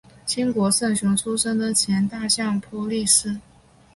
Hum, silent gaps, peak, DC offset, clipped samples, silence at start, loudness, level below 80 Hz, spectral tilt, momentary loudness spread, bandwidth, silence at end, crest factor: none; none; -4 dBFS; under 0.1%; under 0.1%; 0.25 s; -21 LUFS; -54 dBFS; -3 dB/octave; 9 LU; 12 kHz; 0.55 s; 18 dB